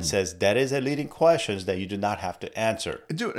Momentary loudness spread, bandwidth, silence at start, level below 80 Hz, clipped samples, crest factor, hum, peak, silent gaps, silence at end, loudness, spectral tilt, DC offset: 10 LU; 15.5 kHz; 0 s; -54 dBFS; under 0.1%; 18 dB; none; -8 dBFS; none; 0 s; -26 LUFS; -4.5 dB/octave; under 0.1%